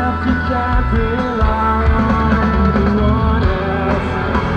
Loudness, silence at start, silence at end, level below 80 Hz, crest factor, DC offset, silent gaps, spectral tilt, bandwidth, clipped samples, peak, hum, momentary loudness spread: -16 LUFS; 0 s; 0 s; -20 dBFS; 12 dB; under 0.1%; none; -8.5 dB/octave; 6.6 kHz; under 0.1%; -2 dBFS; none; 3 LU